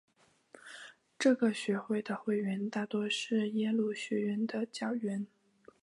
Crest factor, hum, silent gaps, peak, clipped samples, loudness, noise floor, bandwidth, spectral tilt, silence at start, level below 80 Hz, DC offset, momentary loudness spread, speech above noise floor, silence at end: 18 dB; none; none; -16 dBFS; under 0.1%; -34 LUFS; -61 dBFS; 11.5 kHz; -5 dB/octave; 0.65 s; -84 dBFS; under 0.1%; 17 LU; 28 dB; 0.55 s